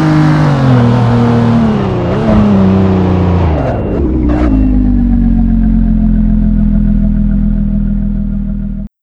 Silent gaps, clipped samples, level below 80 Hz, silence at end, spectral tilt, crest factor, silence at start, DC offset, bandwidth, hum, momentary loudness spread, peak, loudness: none; 0.5%; -14 dBFS; 0.15 s; -9.5 dB/octave; 8 dB; 0 s; under 0.1%; 7 kHz; none; 6 LU; 0 dBFS; -11 LUFS